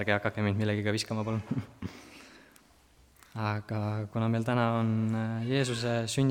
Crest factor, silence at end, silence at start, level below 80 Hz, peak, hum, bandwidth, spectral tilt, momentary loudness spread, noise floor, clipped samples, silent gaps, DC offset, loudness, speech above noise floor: 20 dB; 0 s; 0 s; -64 dBFS; -10 dBFS; none; 15 kHz; -6 dB/octave; 15 LU; -61 dBFS; under 0.1%; none; under 0.1%; -31 LUFS; 31 dB